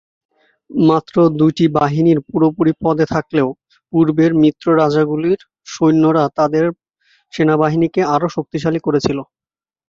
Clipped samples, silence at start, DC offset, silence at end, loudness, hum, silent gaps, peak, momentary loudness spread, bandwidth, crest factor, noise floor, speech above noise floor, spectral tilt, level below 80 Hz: under 0.1%; 0.7 s; under 0.1%; 0.65 s; -15 LUFS; none; none; -2 dBFS; 8 LU; 7.4 kHz; 14 dB; under -90 dBFS; over 76 dB; -7.5 dB/octave; -52 dBFS